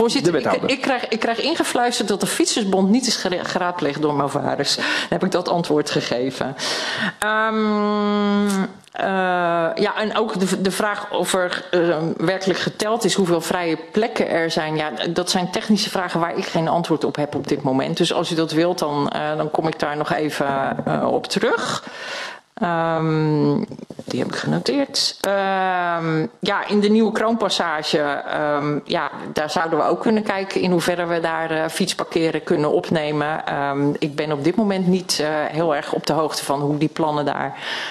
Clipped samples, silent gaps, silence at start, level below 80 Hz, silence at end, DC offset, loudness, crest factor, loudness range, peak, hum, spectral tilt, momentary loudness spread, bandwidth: under 0.1%; none; 0 s; -60 dBFS; 0 s; under 0.1%; -20 LUFS; 20 dB; 2 LU; 0 dBFS; none; -4.5 dB/octave; 4 LU; 13.5 kHz